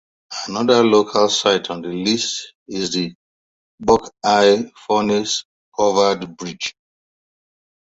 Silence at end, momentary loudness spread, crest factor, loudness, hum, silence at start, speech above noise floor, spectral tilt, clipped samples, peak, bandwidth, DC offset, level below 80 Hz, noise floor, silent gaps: 1.2 s; 14 LU; 18 dB; -18 LUFS; none; 0.3 s; over 72 dB; -3.5 dB/octave; under 0.1%; 0 dBFS; 8 kHz; under 0.1%; -54 dBFS; under -90 dBFS; 2.55-2.66 s, 3.15-3.78 s, 5.45-5.72 s